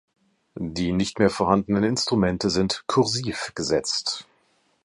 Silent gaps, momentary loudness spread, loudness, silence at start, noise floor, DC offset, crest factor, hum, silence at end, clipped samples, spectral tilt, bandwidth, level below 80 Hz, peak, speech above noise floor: none; 8 LU; -23 LUFS; 0.55 s; -66 dBFS; under 0.1%; 20 dB; none; 0.65 s; under 0.1%; -4.5 dB/octave; 11.5 kHz; -48 dBFS; -4 dBFS; 42 dB